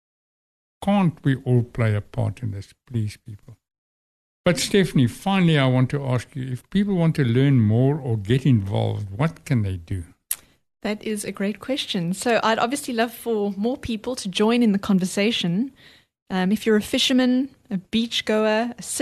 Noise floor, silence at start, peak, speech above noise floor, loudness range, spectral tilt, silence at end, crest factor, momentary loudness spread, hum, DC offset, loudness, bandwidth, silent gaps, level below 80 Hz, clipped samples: under -90 dBFS; 0.8 s; -2 dBFS; over 68 dB; 5 LU; -5.5 dB/octave; 0 s; 20 dB; 11 LU; none; under 0.1%; -22 LUFS; 13 kHz; 3.78-4.44 s, 16.22-16.26 s; -52 dBFS; under 0.1%